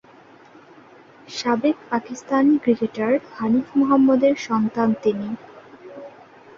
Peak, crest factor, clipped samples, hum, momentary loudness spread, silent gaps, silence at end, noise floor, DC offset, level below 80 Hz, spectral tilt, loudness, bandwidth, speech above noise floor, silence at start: -6 dBFS; 16 dB; under 0.1%; none; 17 LU; none; 0.5 s; -48 dBFS; under 0.1%; -62 dBFS; -6 dB/octave; -20 LUFS; 7.6 kHz; 29 dB; 1.3 s